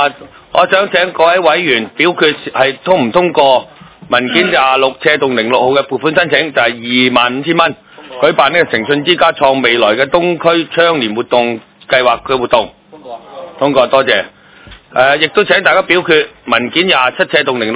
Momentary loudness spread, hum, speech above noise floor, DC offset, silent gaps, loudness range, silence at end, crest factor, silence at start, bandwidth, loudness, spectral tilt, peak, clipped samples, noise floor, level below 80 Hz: 5 LU; none; 26 dB; under 0.1%; none; 3 LU; 0 s; 12 dB; 0 s; 4 kHz; -11 LUFS; -8 dB/octave; 0 dBFS; 1%; -38 dBFS; -50 dBFS